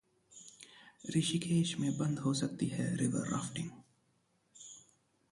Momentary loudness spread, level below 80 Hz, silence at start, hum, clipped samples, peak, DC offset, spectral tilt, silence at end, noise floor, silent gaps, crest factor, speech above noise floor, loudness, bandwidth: 21 LU; -70 dBFS; 0.3 s; none; under 0.1%; -20 dBFS; under 0.1%; -5 dB/octave; 0.5 s; -75 dBFS; none; 18 dB; 41 dB; -35 LUFS; 11.5 kHz